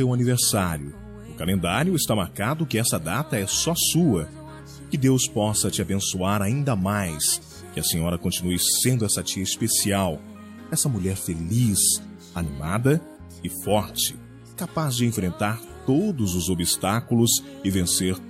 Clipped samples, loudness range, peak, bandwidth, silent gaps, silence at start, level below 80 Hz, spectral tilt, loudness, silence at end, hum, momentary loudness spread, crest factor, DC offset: under 0.1%; 3 LU; -8 dBFS; 16 kHz; none; 0 s; -50 dBFS; -4 dB/octave; -23 LUFS; 0 s; none; 13 LU; 16 dB; under 0.1%